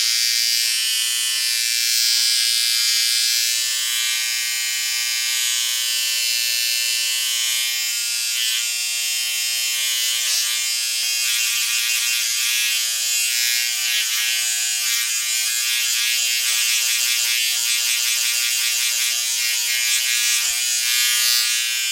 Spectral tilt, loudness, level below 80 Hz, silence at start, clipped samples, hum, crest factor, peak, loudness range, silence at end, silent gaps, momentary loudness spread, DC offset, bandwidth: 8 dB/octave; -17 LUFS; -76 dBFS; 0 s; under 0.1%; none; 18 dB; -2 dBFS; 2 LU; 0 s; none; 3 LU; under 0.1%; 16.5 kHz